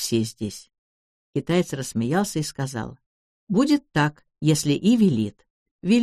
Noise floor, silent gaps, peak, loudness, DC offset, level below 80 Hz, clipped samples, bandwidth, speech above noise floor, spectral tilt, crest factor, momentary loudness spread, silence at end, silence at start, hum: under -90 dBFS; 0.78-1.33 s, 3.06-3.47 s, 5.50-5.79 s; -8 dBFS; -23 LUFS; under 0.1%; -56 dBFS; under 0.1%; 13.5 kHz; over 68 dB; -5.5 dB/octave; 16 dB; 13 LU; 0 s; 0 s; none